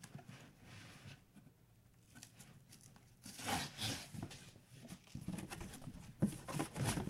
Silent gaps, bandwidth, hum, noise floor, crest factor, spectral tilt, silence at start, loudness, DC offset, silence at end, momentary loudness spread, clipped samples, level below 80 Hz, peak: none; 16 kHz; none; -68 dBFS; 24 dB; -4 dB/octave; 0 s; -46 LUFS; under 0.1%; 0 s; 20 LU; under 0.1%; -64 dBFS; -24 dBFS